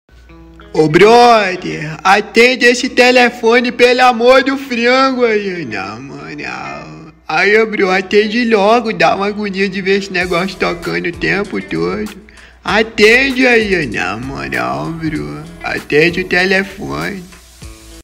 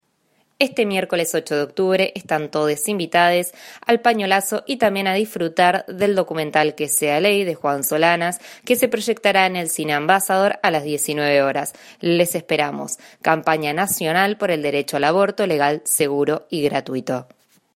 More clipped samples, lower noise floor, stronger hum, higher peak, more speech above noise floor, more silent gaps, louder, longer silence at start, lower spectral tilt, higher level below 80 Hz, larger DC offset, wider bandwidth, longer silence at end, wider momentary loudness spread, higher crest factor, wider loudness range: neither; second, -38 dBFS vs -64 dBFS; neither; about the same, 0 dBFS vs 0 dBFS; second, 26 dB vs 45 dB; neither; first, -12 LUFS vs -19 LUFS; second, 0.3 s vs 0.6 s; about the same, -4.5 dB/octave vs -3.5 dB/octave; first, -40 dBFS vs -66 dBFS; neither; about the same, 16 kHz vs 16 kHz; second, 0 s vs 0.5 s; first, 15 LU vs 7 LU; second, 12 dB vs 20 dB; first, 7 LU vs 2 LU